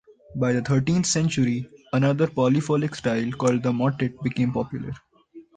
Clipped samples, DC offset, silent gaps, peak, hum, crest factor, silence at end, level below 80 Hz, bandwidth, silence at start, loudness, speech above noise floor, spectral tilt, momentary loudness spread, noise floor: under 0.1%; under 0.1%; none; -8 dBFS; none; 14 dB; 0.15 s; -54 dBFS; 9.6 kHz; 0.3 s; -24 LUFS; 26 dB; -6 dB/octave; 10 LU; -49 dBFS